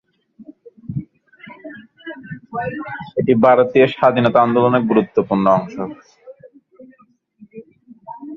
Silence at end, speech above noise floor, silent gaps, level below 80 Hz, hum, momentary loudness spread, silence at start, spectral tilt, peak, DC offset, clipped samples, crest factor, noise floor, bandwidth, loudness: 0 s; 40 dB; none; -56 dBFS; none; 23 LU; 0.4 s; -8.5 dB/octave; 0 dBFS; under 0.1%; under 0.1%; 18 dB; -55 dBFS; 6.6 kHz; -16 LUFS